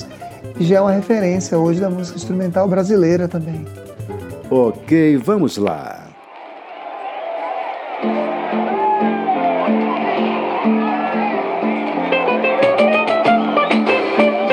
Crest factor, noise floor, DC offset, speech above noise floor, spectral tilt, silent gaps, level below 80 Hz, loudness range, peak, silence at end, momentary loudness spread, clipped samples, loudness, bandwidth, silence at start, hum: 16 dB; -37 dBFS; under 0.1%; 21 dB; -6.5 dB/octave; none; -58 dBFS; 5 LU; -2 dBFS; 0 s; 16 LU; under 0.1%; -17 LUFS; 14 kHz; 0 s; none